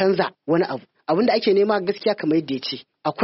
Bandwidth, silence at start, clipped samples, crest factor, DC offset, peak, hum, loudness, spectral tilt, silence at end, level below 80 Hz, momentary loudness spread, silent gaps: 6 kHz; 0 s; under 0.1%; 16 dB; under 0.1%; -6 dBFS; none; -22 LUFS; -4 dB/octave; 0 s; -68 dBFS; 10 LU; none